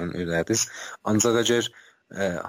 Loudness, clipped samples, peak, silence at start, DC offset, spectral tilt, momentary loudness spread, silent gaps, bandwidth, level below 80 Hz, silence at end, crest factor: -24 LUFS; under 0.1%; -10 dBFS; 0 s; under 0.1%; -3.5 dB/octave; 12 LU; none; 16 kHz; -56 dBFS; 0 s; 16 dB